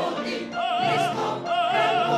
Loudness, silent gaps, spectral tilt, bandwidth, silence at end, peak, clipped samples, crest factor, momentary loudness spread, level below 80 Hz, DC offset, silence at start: -24 LUFS; none; -4.5 dB/octave; 13 kHz; 0 s; -10 dBFS; under 0.1%; 14 dB; 7 LU; -66 dBFS; under 0.1%; 0 s